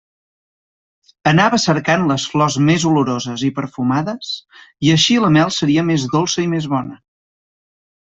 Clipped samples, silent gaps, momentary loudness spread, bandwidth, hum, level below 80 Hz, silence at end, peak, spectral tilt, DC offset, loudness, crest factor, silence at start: under 0.1%; none; 9 LU; 8 kHz; none; -54 dBFS; 1.25 s; -2 dBFS; -5 dB/octave; under 0.1%; -16 LUFS; 16 dB; 1.25 s